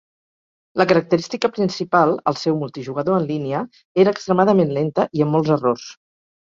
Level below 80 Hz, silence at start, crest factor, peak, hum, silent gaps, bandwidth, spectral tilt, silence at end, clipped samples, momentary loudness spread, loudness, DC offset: -62 dBFS; 0.75 s; 18 dB; -2 dBFS; none; 3.85-3.95 s; 7.6 kHz; -7 dB/octave; 0.55 s; under 0.1%; 9 LU; -19 LUFS; under 0.1%